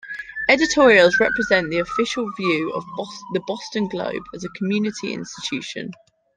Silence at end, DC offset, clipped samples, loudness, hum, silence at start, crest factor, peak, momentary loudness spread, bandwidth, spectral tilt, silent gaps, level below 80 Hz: 0.4 s; under 0.1%; under 0.1%; -20 LUFS; none; 0.05 s; 20 dB; -2 dBFS; 17 LU; 9.8 kHz; -4 dB/octave; none; -54 dBFS